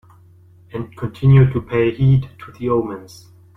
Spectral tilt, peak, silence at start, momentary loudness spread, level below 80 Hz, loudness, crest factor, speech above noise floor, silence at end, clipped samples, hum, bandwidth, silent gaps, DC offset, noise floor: -9.5 dB/octave; -2 dBFS; 0.75 s; 19 LU; -40 dBFS; -17 LUFS; 16 dB; 31 dB; 0.5 s; under 0.1%; none; 6 kHz; none; under 0.1%; -47 dBFS